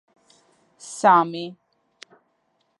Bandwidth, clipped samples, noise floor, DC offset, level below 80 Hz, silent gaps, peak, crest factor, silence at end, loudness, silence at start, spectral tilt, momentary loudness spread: 11.5 kHz; under 0.1%; -70 dBFS; under 0.1%; -82 dBFS; none; -4 dBFS; 22 dB; 1.25 s; -19 LUFS; 0.85 s; -4.5 dB/octave; 21 LU